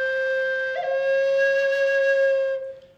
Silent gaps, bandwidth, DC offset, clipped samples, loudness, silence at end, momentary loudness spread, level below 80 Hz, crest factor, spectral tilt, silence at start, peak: none; 7.2 kHz; under 0.1%; under 0.1%; -22 LUFS; 0.15 s; 5 LU; -70 dBFS; 10 dB; -1 dB/octave; 0 s; -12 dBFS